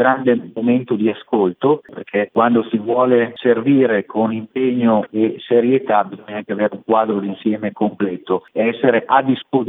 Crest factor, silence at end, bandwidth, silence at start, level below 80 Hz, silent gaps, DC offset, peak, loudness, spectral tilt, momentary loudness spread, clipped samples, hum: 16 dB; 0 s; 4 kHz; 0 s; -72 dBFS; none; under 0.1%; 0 dBFS; -17 LUFS; -10 dB/octave; 7 LU; under 0.1%; none